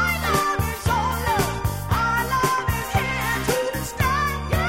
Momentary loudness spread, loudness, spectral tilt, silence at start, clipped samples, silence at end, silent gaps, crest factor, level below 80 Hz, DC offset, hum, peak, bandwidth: 3 LU; -22 LUFS; -4.5 dB/octave; 0 s; under 0.1%; 0 s; none; 16 dB; -32 dBFS; under 0.1%; none; -8 dBFS; 17 kHz